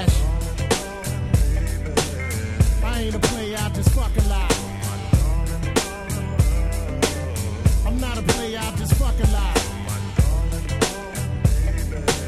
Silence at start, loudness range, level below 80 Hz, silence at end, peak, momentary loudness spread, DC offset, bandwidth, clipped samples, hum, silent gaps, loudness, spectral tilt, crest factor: 0 s; 1 LU; -24 dBFS; 0 s; -4 dBFS; 6 LU; under 0.1%; 14.5 kHz; under 0.1%; none; none; -23 LUFS; -5 dB/octave; 18 dB